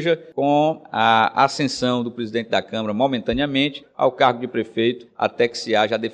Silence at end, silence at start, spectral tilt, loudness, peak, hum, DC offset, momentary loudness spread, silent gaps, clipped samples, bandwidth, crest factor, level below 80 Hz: 0 s; 0 s; -5 dB/octave; -20 LUFS; -2 dBFS; none; under 0.1%; 8 LU; none; under 0.1%; 10 kHz; 18 dB; -52 dBFS